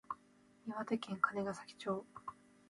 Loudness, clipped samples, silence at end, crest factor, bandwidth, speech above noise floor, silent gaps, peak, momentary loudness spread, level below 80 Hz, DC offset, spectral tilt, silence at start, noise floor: -41 LUFS; under 0.1%; 0.35 s; 24 dB; 11.5 kHz; 27 dB; none; -18 dBFS; 16 LU; -80 dBFS; under 0.1%; -5.5 dB/octave; 0.1 s; -68 dBFS